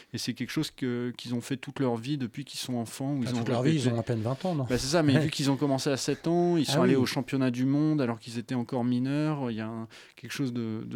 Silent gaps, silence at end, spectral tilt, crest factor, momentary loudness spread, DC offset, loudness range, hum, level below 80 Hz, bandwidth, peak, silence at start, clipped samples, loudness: none; 0 s; -6 dB/octave; 20 dB; 10 LU; under 0.1%; 5 LU; none; -60 dBFS; 16.5 kHz; -10 dBFS; 0 s; under 0.1%; -29 LUFS